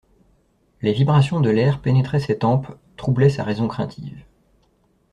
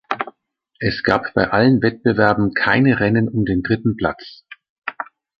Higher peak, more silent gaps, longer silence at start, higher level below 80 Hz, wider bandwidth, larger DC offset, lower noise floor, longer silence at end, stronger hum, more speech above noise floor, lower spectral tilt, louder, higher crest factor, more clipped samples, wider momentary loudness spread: about the same, -4 dBFS vs -2 dBFS; second, none vs 4.69-4.82 s; first, 0.8 s vs 0.1 s; second, -50 dBFS vs -44 dBFS; first, 9.6 kHz vs 6.6 kHz; neither; about the same, -62 dBFS vs -64 dBFS; first, 0.9 s vs 0.35 s; neither; second, 43 dB vs 48 dB; about the same, -8.5 dB/octave vs -8.5 dB/octave; second, -20 LUFS vs -17 LUFS; about the same, 16 dB vs 16 dB; neither; second, 12 LU vs 16 LU